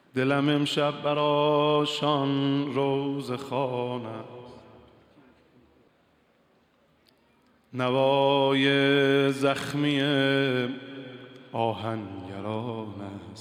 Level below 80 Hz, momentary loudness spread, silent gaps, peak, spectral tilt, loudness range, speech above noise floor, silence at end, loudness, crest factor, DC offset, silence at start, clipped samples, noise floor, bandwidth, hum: -74 dBFS; 17 LU; none; -10 dBFS; -6 dB/octave; 12 LU; 39 dB; 0 s; -25 LUFS; 16 dB; under 0.1%; 0.15 s; under 0.1%; -65 dBFS; 14.5 kHz; none